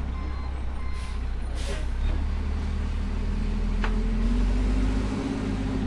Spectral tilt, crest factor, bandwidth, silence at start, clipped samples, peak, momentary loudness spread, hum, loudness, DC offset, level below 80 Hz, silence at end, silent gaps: -7 dB/octave; 12 dB; 11 kHz; 0 s; under 0.1%; -12 dBFS; 7 LU; none; -30 LUFS; under 0.1%; -28 dBFS; 0 s; none